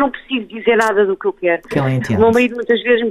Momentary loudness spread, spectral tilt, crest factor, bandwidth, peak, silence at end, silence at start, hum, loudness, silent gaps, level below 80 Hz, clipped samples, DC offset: 6 LU; -6.5 dB/octave; 14 dB; 14.5 kHz; -2 dBFS; 0 s; 0 s; none; -16 LUFS; none; -48 dBFS; under 0.1%; under 0.1%